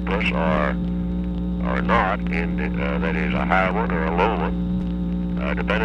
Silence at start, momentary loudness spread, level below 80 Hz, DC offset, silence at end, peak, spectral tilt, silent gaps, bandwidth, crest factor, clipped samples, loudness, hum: 0 s; 6 LU; -30 dBFS; under 0.1%; 0 s; -4 dBFS; -8.5 dB/octave; none; 6.2 kHz; 18 dB; under 0.1%; -22 LUFS; none